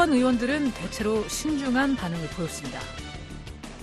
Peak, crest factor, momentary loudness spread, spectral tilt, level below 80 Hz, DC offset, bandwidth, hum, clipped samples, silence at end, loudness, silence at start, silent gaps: -8 dBFS; 20 dB; 16 LU; -4.5 dB/octave; -44 dBFS; under 0.1%; 13 kHz; none; under 0.1%; 0 s; -27 LUFS; 0 s; none